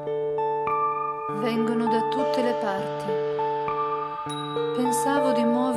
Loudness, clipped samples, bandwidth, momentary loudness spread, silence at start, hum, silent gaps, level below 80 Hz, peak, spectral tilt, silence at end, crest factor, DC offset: -25 LUFS; under 0.1%; 14 kHz; 6 LU; 0 s; none; none; -66 dBFS; -10 dBFS; -5 dB/octave; 0 s; 14 dB; under 0.1%